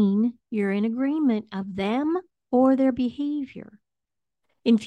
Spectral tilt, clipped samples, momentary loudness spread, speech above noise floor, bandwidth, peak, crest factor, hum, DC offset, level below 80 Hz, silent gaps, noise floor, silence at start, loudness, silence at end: -8 dB/octave; under 0.1%; 11 LU; 64 dB; 8.2 kHz; -8 dBFS; 16 dB; none; under 0.1%; -64 dBFS; none; -88 dBFS; 0 s; -25 LUFS; 0 s